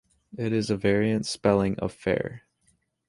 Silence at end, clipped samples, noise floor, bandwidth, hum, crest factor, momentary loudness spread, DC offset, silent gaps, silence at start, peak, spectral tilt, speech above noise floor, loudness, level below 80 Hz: 0.7 s; under 0.1%; -69 dBFS; 11.5 kHz; none; 20 dB; 9 LU; under 0.1%; none; 0.35 s; -8 dBFS; -6 dB/octave; 44 dB; -26 LUFS; -52 dBFS